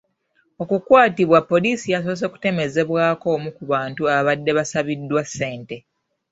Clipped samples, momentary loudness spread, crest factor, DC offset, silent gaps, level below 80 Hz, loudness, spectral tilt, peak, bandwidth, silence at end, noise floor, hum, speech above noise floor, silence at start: under 0.1%; 12 LU; 18 dB; under 0.1%; none; -60 dBFS; -19 LUFS; -5.5 dB/octave; -2 dBFS; 8 kHz; 0.5 s; -65 dBFS; none; 46 dB; 0.6 s